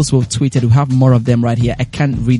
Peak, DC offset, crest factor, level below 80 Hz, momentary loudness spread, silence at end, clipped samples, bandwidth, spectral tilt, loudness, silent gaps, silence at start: 0 dBFS; under 0.1%; 12 dB; -34 dBFS; 5 LU; 0 s; under 0.1%; 11.5 kHz; -6.5 dB/octave; -13 LUFS; none; 0 s